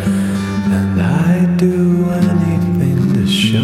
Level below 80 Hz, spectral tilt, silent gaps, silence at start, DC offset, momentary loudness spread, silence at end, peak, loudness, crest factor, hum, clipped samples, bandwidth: -42 dBFS; -7 dB/octave; none; 0 s; under 0.1%; 3 LU; 0 s; -2 dBFS; -14 LUFS; 12 dB; none; under 0.1%; 13.5 kHz